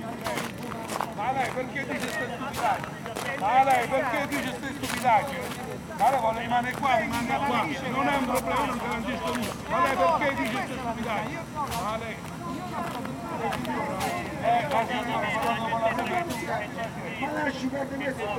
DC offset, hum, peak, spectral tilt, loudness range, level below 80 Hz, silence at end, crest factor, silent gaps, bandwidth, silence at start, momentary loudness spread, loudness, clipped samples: under 0.1%; none; -10 dBFS; -4.5 dB/octave; 4 LU; -52 dBFS; 0 s; 18 dB; none; 18 kHz; 0 s; 10 LU; -28 LUFS; under 0.1%